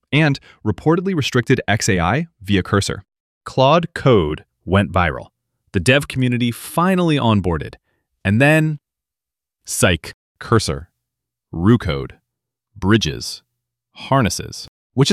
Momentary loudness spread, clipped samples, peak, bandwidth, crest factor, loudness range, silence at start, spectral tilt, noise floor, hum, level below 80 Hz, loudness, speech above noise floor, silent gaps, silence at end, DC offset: 15 LU; under 0.1%; -2 dBFS; 14.5 kHz; 18 dB; 4 LU; 0.1 s; -5.5 dB/octave; -87 dBFS; none; -40 dBFS; -18 LUFS; 70 dB; 3.20-3.41 s, 10.14-10.35 s, 14.68-14.90 s; 0 s; under 0.1%